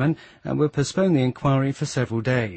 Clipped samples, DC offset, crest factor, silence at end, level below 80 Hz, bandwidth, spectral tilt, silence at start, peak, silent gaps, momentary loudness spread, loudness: under 0.1%; under 0.1%; 14 dB; 0 s; -52 dBFS; 8.8 kHz; -6.5 dB/octave; 0 s; -8 dBFS; none; 5 LU; -23 LUFS